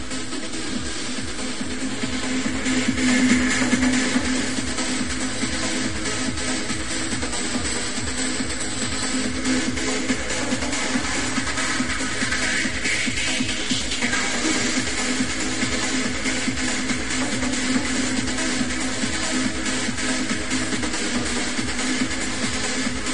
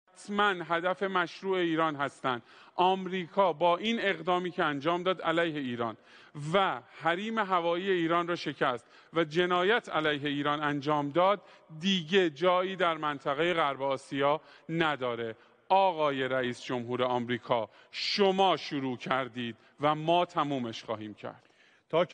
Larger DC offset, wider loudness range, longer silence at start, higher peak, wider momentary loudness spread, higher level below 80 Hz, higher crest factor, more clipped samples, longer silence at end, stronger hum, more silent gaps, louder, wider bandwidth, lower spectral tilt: first, 3% vs under 0.1%; about the same, 3 LU vs 2 LU; second, 0 s vs 0.2 s; first, -6 dBFS vs -10 dBFS; second, 5 LU vs 9 LU; first, -40 dBFS vs -72 dBFS; about the same, 18 dB vs 20 dB; neither; about the same, 0 s vs 0.05 s; neither; neither; first, -23 LUFS vs -30 LUFS; first, 11.5 kHz vs 10 kHz; second, -2.5 dB/octave vs -5.5 dB/octave